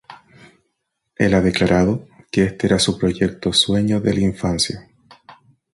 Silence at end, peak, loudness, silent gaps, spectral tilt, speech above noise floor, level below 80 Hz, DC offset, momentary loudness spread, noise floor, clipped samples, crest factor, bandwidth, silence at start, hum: 0.4 s; -2 dBFS; -18 LUFS; none; -5 dB/octave; 57 dB; -40 dBFS; under 0.1%; 5 LU; -74 dBFS; under 0.1%; 18 dB; 11.5 kHz; 0.1 s; none